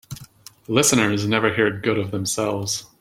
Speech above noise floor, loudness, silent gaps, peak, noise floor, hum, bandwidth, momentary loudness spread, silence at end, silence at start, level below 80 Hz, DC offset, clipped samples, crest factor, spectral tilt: 25 dB; -20 LUFS; none; -2 dBFS; -45 dBFS; none; 16.5 kHz; 9 LU; 0.15 s; 0.1 s; -56 dBFS; under 0.1%; under 0.1%; 20 dB; -3.5 dB/octave